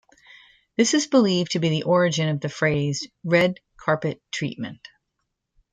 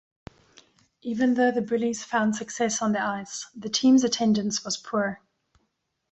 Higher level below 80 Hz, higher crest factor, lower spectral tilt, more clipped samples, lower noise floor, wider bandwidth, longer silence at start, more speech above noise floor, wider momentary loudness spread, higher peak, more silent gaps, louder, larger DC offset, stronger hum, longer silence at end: first, -60 dBFS vs -66 dBFS; about the same, 18 dB vs 16 dB; first, -5 dB/octave vs -3.5 dB/octave; neither; about the same, -78 dBFS vs -76 dBFS; first, 9.6 kHz vs 8.2 kHz; second, 0.8 s vs 1.05 s; first, 56 dB vs 51 dB; about the same, 11 LU vs 13 LU; first, -6 dBFS vs -10 dBFS; neither; first, -22 LUFS vs -25 LUFS; neither; neither; about the same, 1 s vs 0.95 s